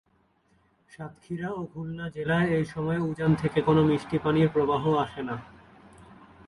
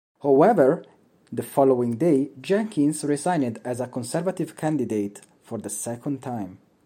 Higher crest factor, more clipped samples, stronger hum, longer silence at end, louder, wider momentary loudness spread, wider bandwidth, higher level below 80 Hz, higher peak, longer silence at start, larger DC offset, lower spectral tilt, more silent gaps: about the same, 18 dB vs 18 dB; neither; neither; about the same, 0.35 s vs 0.3 s; second, -27 LUFS vs -24 LUFS; about the same, 14 LU vs 15 LU; second, 11 kHz vs 16 kHz; first, -54 dBFS vs -72 dBFS; second, -10 dBFS vs -4 dBFS; first, 1 s vs 0.25 s; neither; first, -8 dB/octave vs -6.5 dB/octave; neither